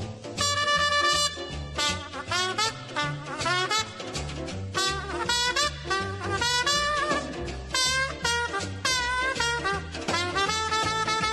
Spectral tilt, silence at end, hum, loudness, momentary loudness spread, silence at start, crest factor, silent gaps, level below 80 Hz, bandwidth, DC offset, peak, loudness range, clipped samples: -2 dB/octave; 0 s; none; -26 LUFS; 10 LU; 0 s; 18 dB; none; -46 dBFS; 13 kHz; under 0.1%; -10 dBFS; 3 LU; under 0.1%